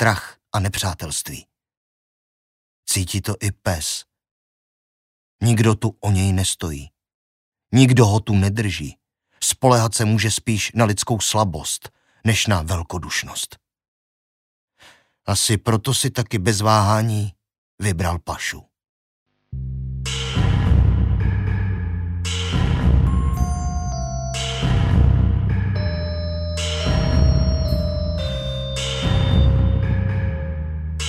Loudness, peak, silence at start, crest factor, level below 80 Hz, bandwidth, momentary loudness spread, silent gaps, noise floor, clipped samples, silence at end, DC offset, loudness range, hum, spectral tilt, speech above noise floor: -20 LUFS; 0 dBFS; 0 s; 20 dB; -26 dBFS; 16 kHz; 10 LU; 1.77-2.83 s, 4.31-5.39 s, 7.14-7.52 s, 13.88-14.68 s, 17.58-17.78 s, 18.89-19.26 s; -52 dBFS; under 0.1%; 0 s; under 0.1%; 7 LU; none; -5 dB/octave; 33 dB